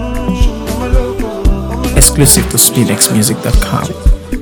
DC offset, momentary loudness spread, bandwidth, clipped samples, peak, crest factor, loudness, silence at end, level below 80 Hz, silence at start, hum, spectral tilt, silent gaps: 0.8%; 10 LU; over 20 kHz; 1%; 0 dBFS; 10 dB; -11 LUFS; 0 s; -14 dBFS; 0 s; none; -4 dB/octave; none